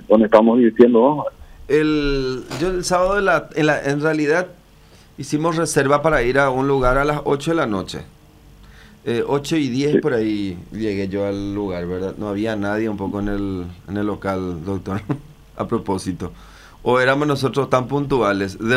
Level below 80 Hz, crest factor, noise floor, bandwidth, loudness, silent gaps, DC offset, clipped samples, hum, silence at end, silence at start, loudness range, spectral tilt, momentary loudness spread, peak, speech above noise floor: -38 dBFS; 18 dB; -47 dBFS; 15 kHz; -19 LUFS; none; under 0.1%; under 0.1%; none; 0 s; 0 s; 7 LU; -6 dB/octave; 11 LU; 0 dBFS; 29 dB